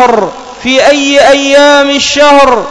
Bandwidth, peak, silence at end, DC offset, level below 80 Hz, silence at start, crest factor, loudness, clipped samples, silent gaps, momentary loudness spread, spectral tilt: 11 kHz; 0 dBFS; 0 s; under 0.1%; -36 dBFS; 0 s; 6 dB; -5 LUFS; 10%; none; 8 LU; -2 dB/octave